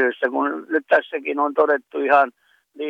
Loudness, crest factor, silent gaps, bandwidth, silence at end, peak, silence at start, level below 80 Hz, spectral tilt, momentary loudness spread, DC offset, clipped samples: -20 LUFS; 16 dB; none; 6.4 kHz; 0 s; -4 dBFS; 0 s; -70 dBFS; -5 dB/octave; 7 LU; under 0.1%; under 0.1%